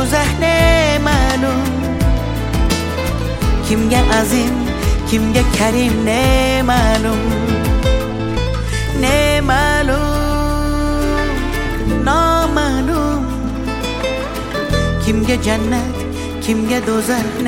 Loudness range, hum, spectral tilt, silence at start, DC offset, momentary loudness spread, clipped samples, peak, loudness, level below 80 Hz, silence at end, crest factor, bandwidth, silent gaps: 3 LU; none; -5 dB/octave; 0 s; under 0.1%; 7 LU; under 0.1%; 0 dBFS; -16 LUFS; -20 dBFS; 0 s; 14 dB; 17 kHz; none